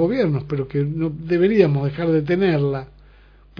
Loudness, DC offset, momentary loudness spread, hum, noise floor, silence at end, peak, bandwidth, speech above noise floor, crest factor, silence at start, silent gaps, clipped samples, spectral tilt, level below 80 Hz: -20 LUFS; under 0.1%; 8 LU; 50 Hz at -40 dBFS; -48 dBFS; 0.75 s; -2 dBFS; 5.4 kHz; 29 dB; 18 dB; 0 s; none; under 0.1%; -10 dB/octave; -46 dBFS